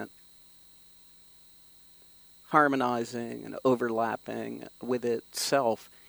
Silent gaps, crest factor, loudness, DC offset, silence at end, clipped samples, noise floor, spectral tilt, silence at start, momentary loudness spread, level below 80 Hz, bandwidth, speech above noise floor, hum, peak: none; 26 dB; -29 LUFS; under 0.1%; 0.25 s; under 0.1%; -56 dBFS; -4 dB/octave; 0 s; 13 LU; -74 dBFS; over 20 kHz; 27 dB; 60 Hz at -65 dBFS; -6 dBFS